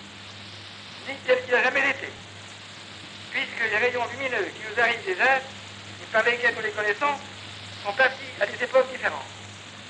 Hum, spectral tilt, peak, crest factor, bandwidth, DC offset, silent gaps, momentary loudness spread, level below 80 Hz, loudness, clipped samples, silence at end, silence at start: none; -3 dB/octave; -8 dBFS; 18 dB; 10 kHz; under 0.1%; none; 18 LU; -68 dBFS; -24 LUFS; under 0.1%; 0 s; 0 s